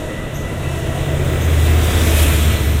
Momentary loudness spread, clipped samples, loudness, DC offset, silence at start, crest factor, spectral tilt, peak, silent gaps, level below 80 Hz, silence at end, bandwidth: 10 LU; under 0.1%; -16 LUFS; under 0.1%; 0 s; 14 dB; -5 dB/octave; -2 dBFS; none; -18 dBFS; 0 s; 16 kHz